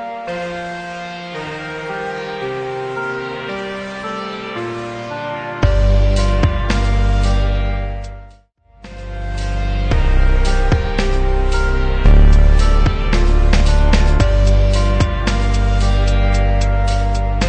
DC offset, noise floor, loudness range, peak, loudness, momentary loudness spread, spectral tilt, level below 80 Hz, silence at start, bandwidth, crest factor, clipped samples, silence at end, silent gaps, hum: under 0.1%; -48 dBFS; 9 LU; -2 dBFS; -18 LUFS; 11 LU; -6 dB/octave; -16 dBFS; 0 s; 9.2 kHz; 12 dB; under 0.1%; 0 s; none; none